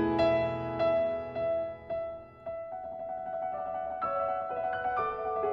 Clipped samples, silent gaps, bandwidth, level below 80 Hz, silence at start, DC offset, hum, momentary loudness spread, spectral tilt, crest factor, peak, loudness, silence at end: under 0.1%; none; 6 kHz; -60 dBFS; 0 s; under 0.1%; none; 12 LU; -8 dB/octave; 16 dB; -16 dBFS; -32 LUFS; 0 s